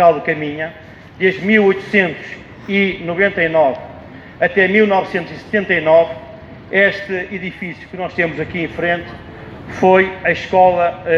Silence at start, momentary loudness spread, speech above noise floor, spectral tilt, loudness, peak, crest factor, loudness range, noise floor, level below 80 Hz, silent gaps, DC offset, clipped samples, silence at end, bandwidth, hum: 0 s; 19 LU; 20 dB; -7 dB/octave; -15 LUFS; 0 dBFS; 16 dB; 4 LU; -35 dBFS; -48 dBFS; none; under 0.1%; under 0.1%; 0 s; 7.2 kHz; none